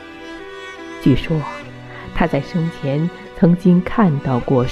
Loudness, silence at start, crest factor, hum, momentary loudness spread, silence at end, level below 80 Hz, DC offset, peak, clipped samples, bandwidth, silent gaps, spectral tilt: -18 LUFS; 0 s; 16 dB; none; 18 LU; 0 s; -36 dBFS; under 0.1%; -2 dBFS; under 0.1%; 7.4 kHz; none; -8.5 dB/octave